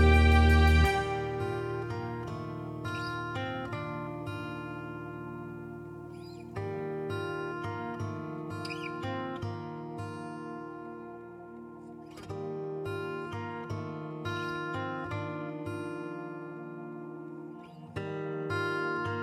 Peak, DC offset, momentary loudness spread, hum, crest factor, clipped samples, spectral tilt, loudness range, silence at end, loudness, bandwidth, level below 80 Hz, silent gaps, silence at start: -10 dBFS; under 0.1%; 13 LU; none; 22 dB; under 0.1%; -7 dB/octave; 7 LU; 0 s; -34 LUFS; 12.5 kHz; -38 dBFS; none; 0 s